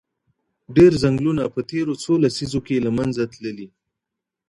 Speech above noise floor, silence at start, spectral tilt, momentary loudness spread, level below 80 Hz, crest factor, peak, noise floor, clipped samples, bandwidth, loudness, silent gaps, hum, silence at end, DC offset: 65 dB; 0.7 s; -7 dB/octave; 13 LU; -48 dBFS; 18 dB; -2 dBFS; -84 dBFS; under 0.1%; 11.5 kHz; -20 LUFS; none; none; 0.85 s; under 0.1%